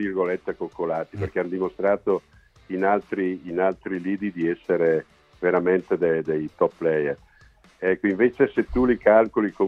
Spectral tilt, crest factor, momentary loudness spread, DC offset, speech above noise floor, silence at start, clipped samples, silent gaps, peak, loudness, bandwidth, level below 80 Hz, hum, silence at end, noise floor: -9 dB/octave; 20 dB; 8 LU; under 0.1%; 32 dB; 0 s; under 0.1%; none; -4 dBFS; -24 LUFS; 6.4 kHz; -48 dBFS; none; 0 s; -54 dBFS